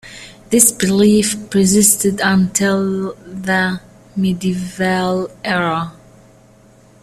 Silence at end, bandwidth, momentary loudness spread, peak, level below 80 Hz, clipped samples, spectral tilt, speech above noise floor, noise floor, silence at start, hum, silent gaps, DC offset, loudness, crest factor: 1.1 s; 15 kHz; 15 LU; 0 dBFS; -48 dBFS; under 0.1%; -4 dB/octave; 32 dB; -47 dBFS; 0.05 s; none; none; under 0.1%; -15 LUFS; 16 dB